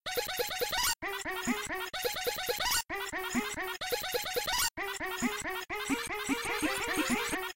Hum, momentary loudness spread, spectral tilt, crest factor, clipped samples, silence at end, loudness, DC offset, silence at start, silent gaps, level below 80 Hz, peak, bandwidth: none; 6 LU; -1.5 dB/octave; 18 dB; under 0.1%; 0 s; -33 LUFS; 0.1%; 0 s; none; -56 dBFS; -16 dBFS; 17 kHz